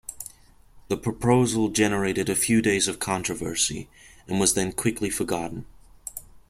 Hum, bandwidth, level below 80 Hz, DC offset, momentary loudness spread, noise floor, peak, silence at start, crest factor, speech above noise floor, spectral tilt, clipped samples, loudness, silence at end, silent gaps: none; 16.5 kHz; -50 dBFS; under 0.1%; 17 LU; -53 dBFS; -6 dBFS; 0.1 s; 20 dB; 29 dB; -4 dB/octave; under 0.1%; -24 LUFS; 0.1 s; none